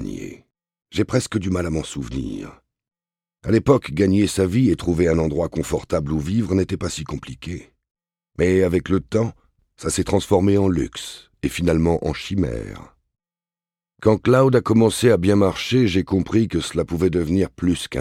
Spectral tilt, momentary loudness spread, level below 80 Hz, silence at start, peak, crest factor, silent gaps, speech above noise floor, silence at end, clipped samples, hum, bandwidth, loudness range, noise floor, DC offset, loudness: -6.5 dB/octave; 15 LU; -40 dBFS; 0 s; -4 dBFS; 18 dB; 7.91-7.95 s; over 71 dB; 0 s; under 0.1%; none; 16 kHz; 6 LU; under -90 dBFS; under 0.1%; -20 LUFS